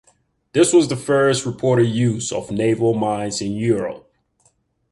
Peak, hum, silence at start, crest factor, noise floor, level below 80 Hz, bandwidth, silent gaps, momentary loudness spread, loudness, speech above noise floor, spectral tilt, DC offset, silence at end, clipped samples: -2 dBFS; none; 0.55 s; 18 dB; -62 dBFS; -54 dBFS; 11.5 kHz; none; 9 LU; -19 LUFS; 44 dB; -5.5 dB/octave; under 0.1%; 0.95 s; under 0.1%